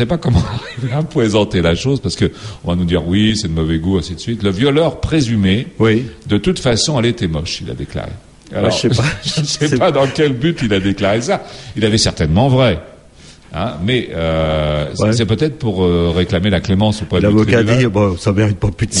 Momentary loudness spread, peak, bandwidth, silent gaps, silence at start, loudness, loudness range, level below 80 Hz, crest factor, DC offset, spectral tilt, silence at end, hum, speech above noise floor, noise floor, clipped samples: 8 LU; 0 dBFS; 11.5 kHz; none; 0 s; -15 LUFS; 3 LU; -32 dBFS; 14 dB; under 0.1%; -5.5 dB/octave; 0 s; none; 26 dB; -41 dBFS; under 0.1%